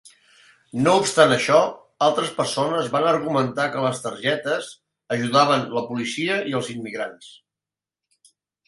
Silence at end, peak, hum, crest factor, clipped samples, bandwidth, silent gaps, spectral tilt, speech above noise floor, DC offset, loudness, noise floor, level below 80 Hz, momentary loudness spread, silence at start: 1.35 s; 0 dBFS; none; 22 dB; under 0.1%; 11.5 kHz; none; -4 dB/octave; 68 dB; under 0.1%; -21 LUFS; -89 dBFS; -64 dBFS; 12 LU; 0.05 s